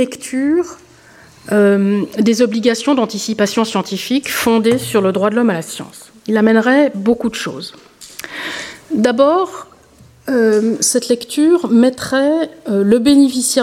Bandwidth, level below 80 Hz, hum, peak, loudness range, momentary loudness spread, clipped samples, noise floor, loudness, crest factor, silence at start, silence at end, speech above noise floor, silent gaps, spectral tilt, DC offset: 16.5 kHz; -54 dBFS; none; -2 dBFS; 3 LU; 15 LU; under 0.1%; -45 dBFS; -14 LUFS; 14 dB; 0 s; 0 s; 31 dB; none; -4.5 dB/octave; under 0.1%